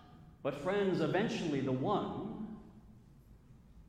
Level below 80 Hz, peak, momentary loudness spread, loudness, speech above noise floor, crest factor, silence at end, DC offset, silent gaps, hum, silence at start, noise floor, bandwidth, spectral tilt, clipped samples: -62 dBFS; -20 dBFS; 12 LU; -36 LUFS; 25 dB; 16 dB; 0.05 s; under 0.1%; none; none; 0 s; -59 dBFS; 12 kHz; -6.5 dB/octave; under 0.1%